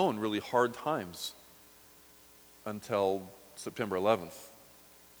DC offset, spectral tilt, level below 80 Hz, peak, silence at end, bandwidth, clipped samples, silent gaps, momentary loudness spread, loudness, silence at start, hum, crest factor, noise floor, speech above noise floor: under 0.1%; -5 dB/octave; -72 dBFS; -12 dBFS; 0.55 s; over 20 kHz; under 0.1%; none; 22 LU; -33 LUFS; 0 s; none; 22 dB; -58 dBFS; 26 dB